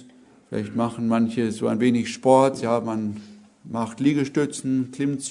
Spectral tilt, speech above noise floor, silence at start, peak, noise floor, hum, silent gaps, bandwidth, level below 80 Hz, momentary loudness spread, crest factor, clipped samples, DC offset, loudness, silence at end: -6 dB/octave; 29 dB; 0 s; -2 dBFS; -51 dBFS; none; none; 11 kHz; -66 dBFS; 12 LU; 20 dB; under 0.1%; under 0.1%; -23 LUFS; 0 s